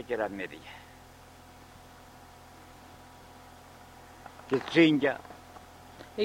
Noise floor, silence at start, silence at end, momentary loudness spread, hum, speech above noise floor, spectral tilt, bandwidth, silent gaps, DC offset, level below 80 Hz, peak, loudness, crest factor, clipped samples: -52 dBFS; 0 s; 0 s; 28 LU; none; 25 dB; -6 dB/octave; 16 kHz; none; under 0.1%; -64 dBFS; -10 dBFS; -28 LUFS; 24 dB; under 0.1%